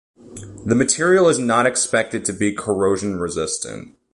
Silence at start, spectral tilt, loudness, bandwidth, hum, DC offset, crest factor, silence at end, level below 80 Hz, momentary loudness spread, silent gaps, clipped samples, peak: 0.25 s; -4 dB/octave; -18 LUFS; 11.5 kHz; none; under 0.1%; 16 dB; 0.25 s; -50 dBFS; 16 LU; none; under 0.1%; -4 dBFS